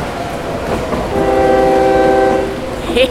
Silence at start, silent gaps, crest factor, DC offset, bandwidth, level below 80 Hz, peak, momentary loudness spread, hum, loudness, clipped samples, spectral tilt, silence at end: 0 s; none; 12 dB; under 0.1%; 15.5 kHz; -30 dBFS; 0 dBFS; 10 LU; none; -14 LUFS; under 0.1%; -5.5 dB/octave; 0 s